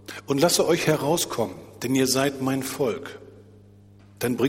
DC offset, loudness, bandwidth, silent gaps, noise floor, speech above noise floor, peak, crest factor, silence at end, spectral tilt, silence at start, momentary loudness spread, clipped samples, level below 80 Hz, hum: under 0.1%; -24 LUFS; 16.5 kHz; none; -50 dBFS; 27 dB; -6 dBFS; 20 dB; 0 s; -4 dB/octave; 0.1 s; 13 LU; under 0.1%; -60 dBFS; 50 Hz at -50 dBFS